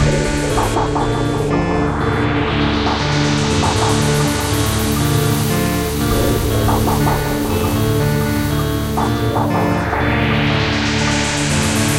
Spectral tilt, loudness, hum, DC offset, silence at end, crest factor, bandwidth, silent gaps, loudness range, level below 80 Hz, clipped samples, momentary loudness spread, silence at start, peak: -5 dB/octave; -16 LUFS; none; under 0.1%; 0 s; 12 dB; 17 kHz; none; 1 LU; -26 dBFS; under 0.1%; 2 LU; 0 s; -4 dBFS